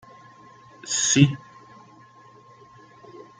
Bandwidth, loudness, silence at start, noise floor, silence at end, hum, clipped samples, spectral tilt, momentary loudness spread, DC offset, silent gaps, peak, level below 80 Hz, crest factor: 9.8 kHz; -20 LUFS; 0.85 s; -51 dBFS; 0.2 s; none; under 0.1%; -3.5 dB/octave; 25 LU; under 0.1%; none; -4 dBFS; -66 dBFS; 24 dB